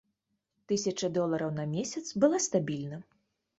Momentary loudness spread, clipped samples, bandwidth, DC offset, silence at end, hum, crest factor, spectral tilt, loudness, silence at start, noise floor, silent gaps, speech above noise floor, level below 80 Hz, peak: 10 LU; under 0.1%; 8.2 kHz; under 0.1%; 0.55 s; none; 20 dB; -5 dB/octave; -31 LUFS; 0.7 s; -81 dBFS; none; 51 dB; -72 dBFS; -12 dBFS